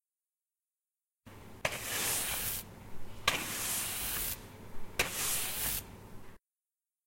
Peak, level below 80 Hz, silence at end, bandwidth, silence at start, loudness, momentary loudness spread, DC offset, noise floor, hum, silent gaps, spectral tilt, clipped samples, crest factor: -10 dBFS; -54 dBFS; 0.7 s; 16.5 kHz; 1.25 s; -34 LUFS; 20 LU; under 0.1%; under -90 dBFS; none; none; -1 dB/octave; under 0.1%; 28 dB